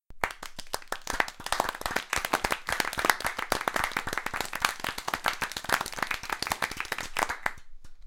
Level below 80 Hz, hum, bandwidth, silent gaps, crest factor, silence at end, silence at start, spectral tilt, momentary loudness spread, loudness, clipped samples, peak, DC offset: -48 dBFS; none; 17 kHz; none; 28 dB; 0 s; 0.1 s; -1.5 dB/octave; 6 LU; -30 LUFS; under 0.1%; -4 dBFS; under 0.1%